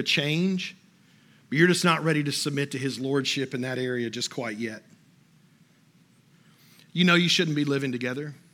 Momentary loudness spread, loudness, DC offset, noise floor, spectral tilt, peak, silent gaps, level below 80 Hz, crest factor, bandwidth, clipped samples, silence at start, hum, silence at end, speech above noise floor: 12 LU; -25 LUFS; under 0.1%; -60 dBFS; -4.5 dB/octave; -6 dBFS; none; -82 dBFS; 22 dB; 16.5 kHz; under 0.1%; 0 s; none; 0.2 s; 34 dB